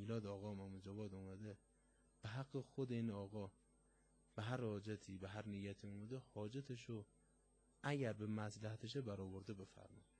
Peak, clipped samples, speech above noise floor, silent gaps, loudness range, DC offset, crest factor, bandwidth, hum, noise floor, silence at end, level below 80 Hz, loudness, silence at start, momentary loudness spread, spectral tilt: -30 dBFS; under 0.1%; 28 dB; none; 2 LU; under 0.1%; 20 dB; 10 kHz; none; -77 dBFS; 0.15 s; -78 dBFS; -50 LUFS; 0 s; 11 LU; -7 dB/octave